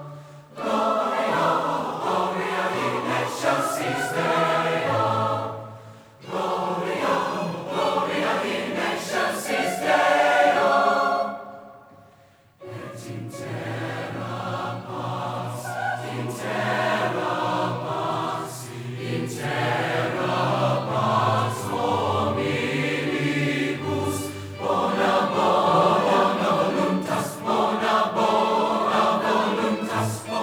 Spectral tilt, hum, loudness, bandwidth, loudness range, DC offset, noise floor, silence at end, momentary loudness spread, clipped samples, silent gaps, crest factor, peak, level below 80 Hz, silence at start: -5 dB/octave; none; -23 LUFS; over 20 kHz; 8 LU; under 0.1%; -55 dBFS; 0 s; 11 LU; under 0.1%; none; 18 dB; -6 dBFS; -68 dBFS; 0 s